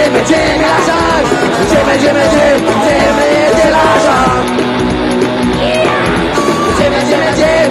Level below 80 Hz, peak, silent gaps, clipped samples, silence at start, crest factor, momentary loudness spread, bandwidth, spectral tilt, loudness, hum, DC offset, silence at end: -30 dBFS; 0 dBFS; none; under 0.1%; 0 s; 10 dB; 4 LU; 15.5 kHz; -4.5 dB/octave; -10 LUFS; none; under 0.1%; 0 s